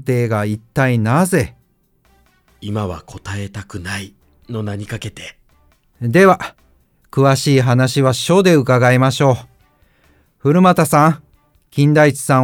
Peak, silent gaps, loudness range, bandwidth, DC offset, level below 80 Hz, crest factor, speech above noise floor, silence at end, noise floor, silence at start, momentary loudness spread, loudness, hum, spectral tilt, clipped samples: 0 dBFS; none; 13 LU; 17.5 kHz; under 0.1%; -48 dBFS; 16 dB; 44 dB; 0 s; -58 dBFS; 0 s; 17 LU; -15 LUFS; none; -6 dB/octave; under 0.1%